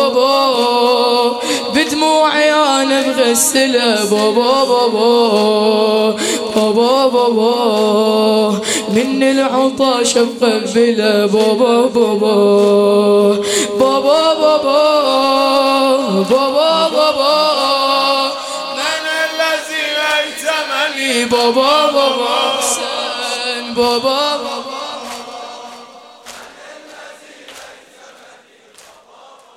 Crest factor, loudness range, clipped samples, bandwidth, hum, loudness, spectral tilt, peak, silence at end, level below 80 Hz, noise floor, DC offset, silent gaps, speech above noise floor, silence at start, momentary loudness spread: 14 dB; 6 LU; under 0.1%; 16.5 kHz; none; -13 LUFS; -3 dB/octave; 0 dBFS; 1.85 s; -60 dBFS; -44 dBFS; under 0.1%; none; 32 dB; 0 s; 7 LU